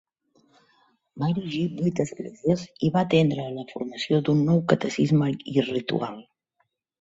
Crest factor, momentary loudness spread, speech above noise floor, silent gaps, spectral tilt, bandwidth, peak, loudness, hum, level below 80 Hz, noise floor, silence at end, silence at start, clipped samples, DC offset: 22 dB; 10 LU; 50 dB; none; -7 dB/octave; 8 kHz; -4 dBFS; -25 LUFS; none; -62 dBFS; -74 dBFS; 0.8 s; 1.15 s; under 0.1%; under 0.1%